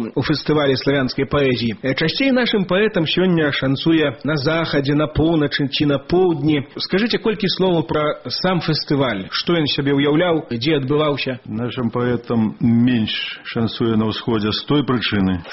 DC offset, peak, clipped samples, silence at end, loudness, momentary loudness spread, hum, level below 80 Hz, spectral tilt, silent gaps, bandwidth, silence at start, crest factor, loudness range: under 0.1%; -6 dBFS; under 0.1%; 0 s; -18 LUFS; 5 LU; none; -44 dBFS; -4.5 dB/octave; none; 6 kHz; 0 s; 12 dB; 2 LU